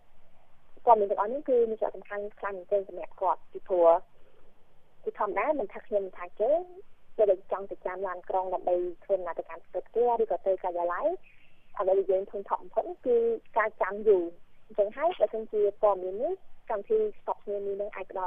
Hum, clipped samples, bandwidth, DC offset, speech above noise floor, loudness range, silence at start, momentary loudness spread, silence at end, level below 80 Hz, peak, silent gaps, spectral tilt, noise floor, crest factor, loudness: none; under 0.1%; 3.7 kHz; under 0.1%; 20 dB; 2 LU; 0.05 s; 12 LU; 0 s; -58 dBFS; -6 dBFS; none; -8 dB/octave; -48 dBFS; 22 dB; -29 LUFS